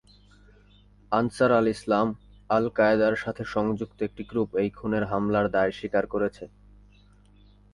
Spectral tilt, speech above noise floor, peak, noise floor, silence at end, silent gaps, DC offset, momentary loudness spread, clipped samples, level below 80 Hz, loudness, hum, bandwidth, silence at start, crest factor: -7 dB/octave; 31 dB; -8 dBFS; -56 dBFS; 1.25 s; none; under 0.1%; 9 LU; under 0.1%; -54 dBFS; -26 LUFS; 50 Hz at -55 dBFS; 11 kHz; 1.1 s; 18 dB